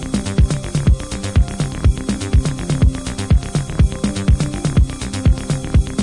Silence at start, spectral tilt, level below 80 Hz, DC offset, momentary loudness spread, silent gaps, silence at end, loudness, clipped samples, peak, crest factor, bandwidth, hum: 0 s; -6 dB/octave; -20 dBFS; under 0.1%; 3 LU; none; 0 s; -18 LUFS; under 0.1%; -2 dBFS; 14 dB; 11.5 kHz; none